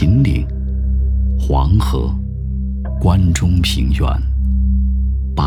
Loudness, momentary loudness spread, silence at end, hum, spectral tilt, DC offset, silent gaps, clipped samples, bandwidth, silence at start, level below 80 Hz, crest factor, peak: -17 LUFS; 8 LU; 0 s; none; -6.5 dB/octave; 0.6%; none; under 0.1%; 12 kHz; 0 s; -16 dBFS; 12 dB; -2 dBFS